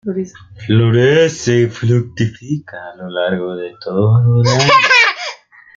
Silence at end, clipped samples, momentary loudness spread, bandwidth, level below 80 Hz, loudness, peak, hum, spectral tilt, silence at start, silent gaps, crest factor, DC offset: 0.4 s; under 0.1%; 16 LU; 7.6 kHz; -50 dBFS; -13 LUFS; 0 dBFS; none; -5.5 dB/octave; 0.05 s; none; 14 dB; under 0.1%